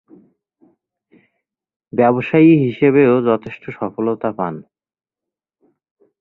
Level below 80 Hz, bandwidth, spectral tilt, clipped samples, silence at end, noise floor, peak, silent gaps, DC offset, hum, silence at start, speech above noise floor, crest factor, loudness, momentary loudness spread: -60 dBFS; 4.1 kHz; -10.5 dB/octave; under 0.1%; 1.6 s; -86 dBFS; -2 dBFS; none; under 0.1%; none; 1.95 s; 71 dB; 18 dB; -15 LUFS; 15 LU